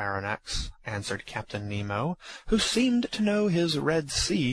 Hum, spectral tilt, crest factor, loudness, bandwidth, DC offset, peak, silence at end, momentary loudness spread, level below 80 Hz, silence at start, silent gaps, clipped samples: none; -4.5 dB/octave; 16 dB; -28 LUFS; 13.5 kHz; under 0.1%; -12 dBFS; 0 s; 10 LU; -44 dBFS; 0 s; none; under 0.1%